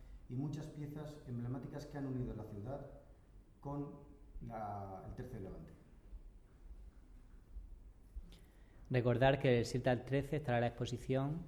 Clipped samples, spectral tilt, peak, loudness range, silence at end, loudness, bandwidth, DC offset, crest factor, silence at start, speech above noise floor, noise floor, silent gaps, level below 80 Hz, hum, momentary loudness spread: under 0.1%; -7 dB/octave; -20 dBFS; 18 LU; 0 s; -40 LUFS; 13 kHz; under 0.1%; 22 dB; 0 s; 22 dB; -61 dBFS; none; -56 dBFS; none; 25 LU